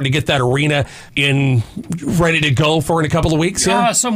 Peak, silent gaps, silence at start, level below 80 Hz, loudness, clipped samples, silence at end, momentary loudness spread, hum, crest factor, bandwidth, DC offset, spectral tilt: -4 dBFS; none; 0 s; -36 dBFS; -15 LUFS; under 0.1%; 0 s; 6 LU; none; 12 dB; 16 kHz; under 0.1%; -4.5 dB/octave